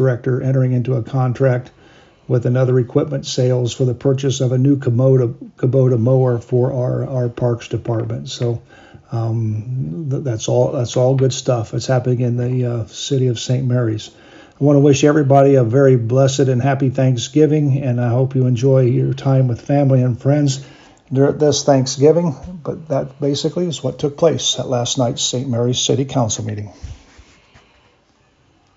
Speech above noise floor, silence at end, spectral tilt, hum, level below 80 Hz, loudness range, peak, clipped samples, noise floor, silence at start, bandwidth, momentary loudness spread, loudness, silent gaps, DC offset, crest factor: 40 dB; 1.8 s; -6 dB/octave; none; -50 dBFS; 6 LU; 0 dBFS; under 0.1%; -56 dBFS; 0 s; 7.8 kHz; 9 LU; -16 LUFS; none; under 0.1%; 16 dB